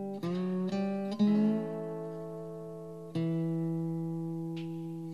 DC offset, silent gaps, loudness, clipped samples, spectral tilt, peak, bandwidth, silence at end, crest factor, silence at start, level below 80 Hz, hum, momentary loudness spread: under 0.1%; none; -34 LUFS; under 0.1%; -9 dB/octave; -18 dBFS; 11 kHz; 0 s; 16 dB; 0 s; -76 dBFS; none; 13 LU